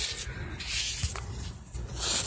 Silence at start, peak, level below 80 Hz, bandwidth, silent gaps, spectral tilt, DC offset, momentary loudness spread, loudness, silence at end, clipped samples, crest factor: 0 s; -18 dBFS; -40 dBFS; 8 kHz; none; -2 dB/octave; under 0.1%; 11 LU; -34 LUFS; 0 s; under 0.1%; 18 dB